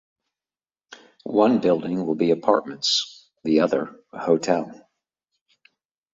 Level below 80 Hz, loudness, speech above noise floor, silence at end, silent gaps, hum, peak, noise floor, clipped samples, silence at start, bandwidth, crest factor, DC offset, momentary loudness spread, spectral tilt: -66 dBFS; -22 LUFS; over 69 dB; 1.4 s; none; none; -2 dBFS; under -90 dBFS; under 0.1%; 1.25 s; 8 kHz; 22 dB; under 0.1%; 14 LU; -4.5 dB/octave